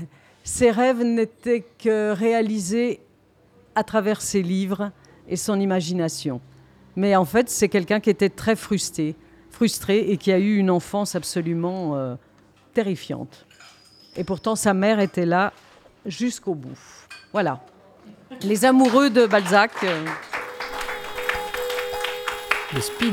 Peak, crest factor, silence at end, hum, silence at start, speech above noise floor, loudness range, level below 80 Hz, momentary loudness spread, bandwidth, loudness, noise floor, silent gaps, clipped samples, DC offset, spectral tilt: 0 dBFS; 22 dB; 0 s; none; 0 s; 36 dB; 7 LU; -56 dBFS; 14 LU; 18 kHz; -22 LUFS; -57 dBFS; none; under 0.1%; under 0.1%; -5 dB/octave